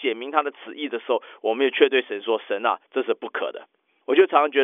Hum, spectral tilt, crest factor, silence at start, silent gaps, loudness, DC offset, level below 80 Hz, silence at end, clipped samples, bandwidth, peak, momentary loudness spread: none; -5 dB/octave; 18 dB; 0 s; none; -23 LUFS; under 0.1%; under -90 dBFS; 0 s; under 0.1%; 3.8 kHz; -4 dBFS; 14 LU